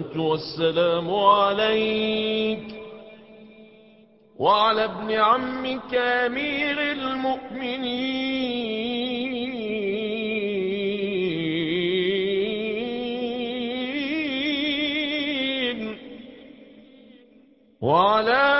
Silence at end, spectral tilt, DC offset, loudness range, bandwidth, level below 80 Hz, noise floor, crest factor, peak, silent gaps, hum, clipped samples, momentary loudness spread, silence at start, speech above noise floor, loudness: 0 s; -9 dB/octave; under 0.1%; 4 LU; 5.8 kHz; -60 dBFS; -55 dBFS; 20 dB; -4 dBFS; none; none; under 0.1%; 9 LU; 0 s; 33 dB; -24 LUFS